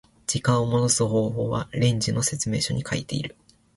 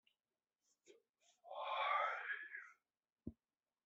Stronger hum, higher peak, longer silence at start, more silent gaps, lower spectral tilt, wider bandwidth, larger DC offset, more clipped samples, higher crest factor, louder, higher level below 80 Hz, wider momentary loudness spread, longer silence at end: neither; first, -8 dBFS vs -28 dBFS; second, 0.3 s vs 0.9 s; second, none vs 1.09-1.13 s, 3.12-3.16 s; first, -4.5 dB/octave vs 0 dB/octave; first, 11.5 kHz vs 7.6 kHz; neither; neither; about the same, 16 dB vs 20 dB; first, -24 LUFS vs -43 LUFS; first, -50 dBFS vs -80 dBFS; second, 7 LU vs 19 LU; about the same, 0.5 s vs 0.55 s